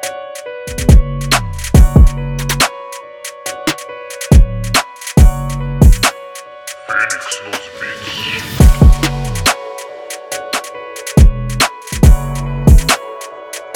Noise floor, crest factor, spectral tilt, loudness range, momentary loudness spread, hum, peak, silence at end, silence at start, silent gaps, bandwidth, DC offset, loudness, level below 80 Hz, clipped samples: -32 dBFS; 12 dB; -4.5 dB/octave; 2 LU; 17 LU; none; 0 dBFS; 0 s; 0 s; none; 18.5 kHz; under 0.1%; -14 LUFS; -14 dBFS; under 0.1%